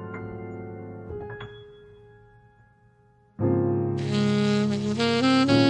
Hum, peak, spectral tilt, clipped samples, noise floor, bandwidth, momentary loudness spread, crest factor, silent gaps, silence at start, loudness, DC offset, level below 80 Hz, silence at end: none; -8 dBFS; -6.5 dB/octave; under 0.1%; -59 dBFS; 10 kHz; 18 LU; 18 dB; none; 0 s; -24 LUFS; under 0.1%; -58 dBFS; 0 s